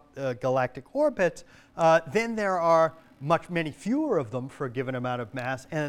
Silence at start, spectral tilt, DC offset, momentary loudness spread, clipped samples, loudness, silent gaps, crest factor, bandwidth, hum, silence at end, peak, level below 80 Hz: 0.15 s; -6 dB/octave; under 0.1%; 11 LU; under 0.1%; -27 LUFS; none; 18 dB; 13 kHz; none; 0 s; -8 dBFS; -62 dBFS